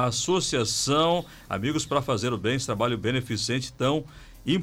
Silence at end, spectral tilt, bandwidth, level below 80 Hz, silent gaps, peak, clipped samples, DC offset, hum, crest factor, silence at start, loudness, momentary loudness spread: 0 s; -4 dB/octave; 16.5 kHz; -52 dBFS; none; -10 dBFS; under 0.1%; under 0.1%; none; 16 dB; 0 s; -26 LUFS; 7 LU